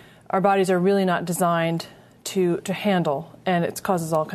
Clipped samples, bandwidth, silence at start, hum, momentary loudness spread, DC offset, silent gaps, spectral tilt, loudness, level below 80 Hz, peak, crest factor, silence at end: under 0.1%; 13.5 kHz; 0.35 s; none; 8 LU; under 0.1%; none; -5.5 dB/octave; -23 LUFS; -64 dBFS; -6 dBFS; 16 dB; 0 s